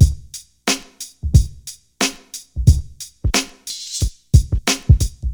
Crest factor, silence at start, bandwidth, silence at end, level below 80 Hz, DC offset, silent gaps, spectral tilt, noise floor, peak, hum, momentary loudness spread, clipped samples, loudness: 18 dB; 0 s; over 20 kHz; 0 s; -22 dBFS; under 0.1%; none; -4.5 dB/octave; -39 dBFS; 0 dBFS; none; 18 LU; under 0.1%; -19 LUFS